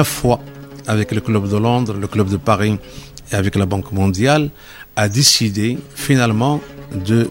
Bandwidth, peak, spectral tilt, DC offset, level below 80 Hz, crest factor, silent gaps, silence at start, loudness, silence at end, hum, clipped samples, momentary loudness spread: 16.5 kHz; 0 dBFS; -4.5 dB/octave; 0.1%; -42 dBFS; 16 dB; none; 0 s; -17 LUFS; 0 s; none; under 0.1%; 13 LU